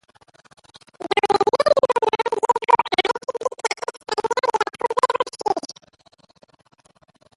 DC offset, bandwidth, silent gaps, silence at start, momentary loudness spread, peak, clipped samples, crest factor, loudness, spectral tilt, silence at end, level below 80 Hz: under 0.1%; 11.5 kHz; none; 1 s; 9 LU; -2 dBFS; under 0.1%; 20 dB; -21 LUFS; -2.5 dB/octave; 1.65 s; -64 dBFS